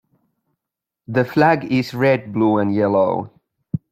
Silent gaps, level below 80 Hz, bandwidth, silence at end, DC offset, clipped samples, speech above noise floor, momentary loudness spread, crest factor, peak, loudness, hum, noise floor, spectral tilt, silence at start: none; -58 dBFS; 15 kHz; 0.15 s; under 0.1%; under 0.1%; 68 dB; 12 LU; 18 dB; -2 dBFS; -18 LUFS; none; -85 dBFS; -8 dB/octave; 1.1 s